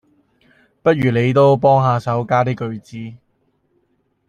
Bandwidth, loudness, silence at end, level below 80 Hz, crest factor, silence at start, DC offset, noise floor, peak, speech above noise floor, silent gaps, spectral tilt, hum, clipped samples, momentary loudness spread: 9.4 kHz; -16 LUFS; 1.1 s; -54 dBFS; 16 dB; 0.85 s; under 0.1%; -65 dBFS; -2 dBFS; 49 dB; none; -8 dB/octave; none; under 0.1%; 19 LU